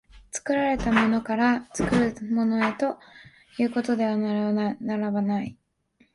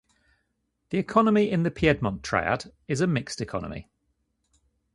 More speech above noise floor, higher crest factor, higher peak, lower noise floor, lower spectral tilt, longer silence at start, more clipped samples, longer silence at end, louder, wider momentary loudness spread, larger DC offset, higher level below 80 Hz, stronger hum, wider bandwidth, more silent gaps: second, 40 dB vs 51 dB; about the same, 20 dB vs 22 dB; about the same, -6 dBFS vs -6 dBFS; second, -64 dBFS vs -76 dBFS; about the same, -5.5 dB/octave vs -6 dB/octave; second, 0.15 s vs 0.9 s; neither; second, 0.6 s vs 1.15 s; about the same, -25 LUFS vs -25 LUFS; second, 8 LU vs 11 LU; neither; about the same, -48 dBFS vs -50 dBFS; neither; about the same, 11.5 kHz vs 11.5 kHz; neither